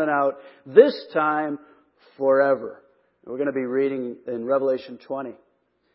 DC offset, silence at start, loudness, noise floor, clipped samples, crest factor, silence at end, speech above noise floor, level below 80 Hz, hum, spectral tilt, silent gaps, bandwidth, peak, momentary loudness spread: under 0.1%; 0 s; -23 LUFS; -68 dBFS; under 0.1%; 22 dB; 0.6 s; 45 dB; -76 dBFS; none; -10 dB/octave; none; 5.8 kHz; 0 dBFS; 18 LU